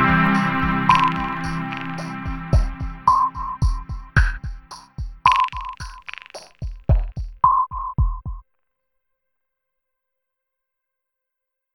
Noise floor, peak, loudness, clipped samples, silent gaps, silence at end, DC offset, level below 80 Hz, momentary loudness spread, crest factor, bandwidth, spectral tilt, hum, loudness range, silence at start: -82 dBFS; -2 dBFS; -21 LUFS; under 0.1%; none; 3.35 s; under 0.1%; -28 dBFS; 18 LU; 22 dB; 11.5 kHz; -6 dB/octave; none; 5 LU; 0 s